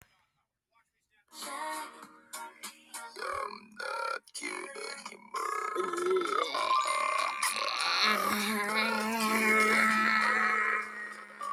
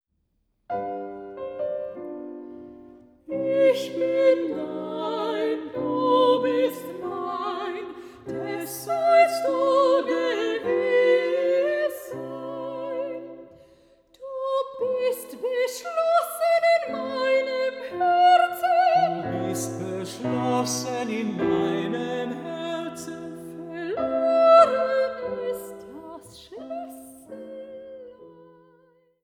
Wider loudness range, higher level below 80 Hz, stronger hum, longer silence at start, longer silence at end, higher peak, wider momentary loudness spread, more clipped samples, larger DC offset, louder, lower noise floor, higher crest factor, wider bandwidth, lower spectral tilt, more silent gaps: first, 14 LU vs 9 LU; second, -78 dBFS vs -66 dBFS; neither; first, 1.35 s vs 0.7 s; second, 0 s vs 0.85 s; second, -12 dBFS vs -4 dBFS; about the same, 18 LU vs 19 LU; neither; neither; second, -29 LUFS vs -24 LUFS; first, -80 dBFS vs -72 dBFS; about the same, 20 dB vs 20 dB; about the same, 19 kHz vs 17.5 kHz; second, -2 dB/octave vs -4.5 dB/octave; neither